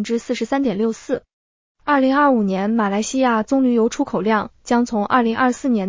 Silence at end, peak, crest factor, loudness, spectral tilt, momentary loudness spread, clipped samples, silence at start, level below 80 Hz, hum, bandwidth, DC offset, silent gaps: 0 s; -4 dBFS; 14 dB; -19 LUFS; -5.5 dB/octave; 7 LU; under 0.1%; 0 s; -54 dBFS; none; 7.6 kHz; under 0.1%; 1.33-1.75 s